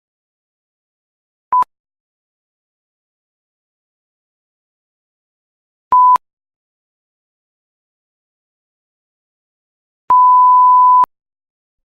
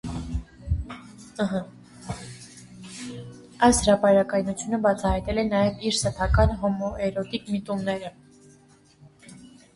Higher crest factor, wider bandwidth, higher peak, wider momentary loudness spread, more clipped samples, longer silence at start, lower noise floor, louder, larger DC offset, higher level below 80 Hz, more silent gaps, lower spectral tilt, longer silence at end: second, 14 dB vs 22 dB; second, 3.4 kHz vs 11.5 kHz; about the same, -4 dBFS vs -4 dBFS; second, 10 LU vs 22 LU; neither; first, 1.5 s vs 0.05 s; first, under -90 dBFS vs -56 dBFS; first, -10 LUFS vs -24 LUFS; neither; second, -66 dBFS vs -36 dBFS; first, 1.80-1.84 s, 2.00-5.91 s, 6.33-6.37 s, 6.56-10.08 s vs none; about the same, -4 dB/octave vs -5 dB/octave; first, 0.85 s vs 0.3 s